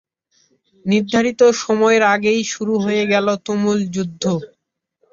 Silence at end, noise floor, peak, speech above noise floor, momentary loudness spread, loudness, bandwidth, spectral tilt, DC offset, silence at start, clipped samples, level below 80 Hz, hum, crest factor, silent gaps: 0.65 s; -66 dBFS; -2 dBFS; 49 dB; 8 LU; -17 LUFS; 7.6 kHz; -5 dB/octave; under 0.1%; 0.85 s; under 0.1%; -60 dBFS; none; 16 dB; none